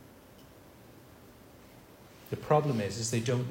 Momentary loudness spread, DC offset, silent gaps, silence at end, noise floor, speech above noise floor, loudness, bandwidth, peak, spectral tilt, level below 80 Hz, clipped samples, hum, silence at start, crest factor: 27 LU; under 0.1%; none; 0 s; -54 dBFS; 25 dB; -31 LUFS; 16.5 kHz; -12 dBFS; -5.5 dB/octave; -64 dBFS; under 0.1%; none; 0 s; 22 dB